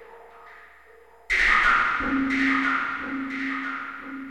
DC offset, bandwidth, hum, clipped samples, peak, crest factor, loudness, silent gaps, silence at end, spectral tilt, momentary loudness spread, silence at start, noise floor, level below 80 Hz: 0.1%; 11.5 kHz; none; under 0.1%; -8 dBFS; 18 dB; -23 LUFS; none; 0 s; -3.5 dB/octave; 14 LU; 0 s; -53 dBFS; -46 dBFS